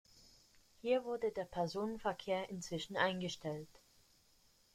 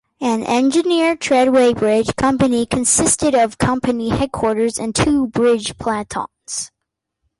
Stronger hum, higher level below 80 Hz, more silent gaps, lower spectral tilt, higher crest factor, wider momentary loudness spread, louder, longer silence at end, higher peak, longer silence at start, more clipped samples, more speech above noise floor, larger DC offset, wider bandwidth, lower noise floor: neither; second, -70 dBFS vs -42 dBFS; neither; about the same, -4.5 dB/octave vs -4 dB/octave; first, 22 dB vs 14 dB; about the same, 9 LU vs 10 LU; second, -40 LUFS vs -17 LUFS; first, 1.1 s vs 0.75 s; second, -20 dBFS vs -2 dBFS; about the same, 0.15 s vs 0.2 s; neither; second, 31 dB vs 63 dB; neither; first, 16 kHz vs 11.5 kHz; second, -71 dBFS vs -79 dBFS